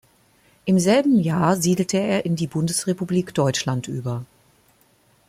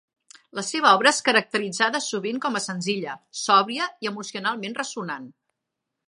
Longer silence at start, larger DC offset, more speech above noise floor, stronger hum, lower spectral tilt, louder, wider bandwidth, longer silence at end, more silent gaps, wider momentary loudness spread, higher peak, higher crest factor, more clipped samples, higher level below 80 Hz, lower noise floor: about the same, 0.65 s vs 0.55 s; neither; second, 39 dB vs 59 dB; neither; first, -5.5 dB/octave vs -2.5 dB/octave; about the same, -21 LUFS vs -23 LUFS; first, 15.5 kHz vs 11.5 kHz; first, 1.05 s vs 0.75 s; neither; second, 11 LU vs 14 LU; about the same, -4 dBFS vs -2 dBFS; second, 18 dB vs 24 dB; neither; first, -58 dBFS vs -80 dBFS; second, -59 dBFS vs -83 dBFS